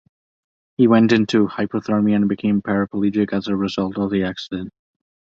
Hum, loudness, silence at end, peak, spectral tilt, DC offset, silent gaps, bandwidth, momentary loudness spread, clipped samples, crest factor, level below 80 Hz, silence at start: none; -19 LUFS; 0.7 s; -2 dBFS; -7 dB/octave; under 0.1%; none; 7.6 kHz; 13 LU; under 0.1%; 18 dB; -54 dBFS; 0.8 s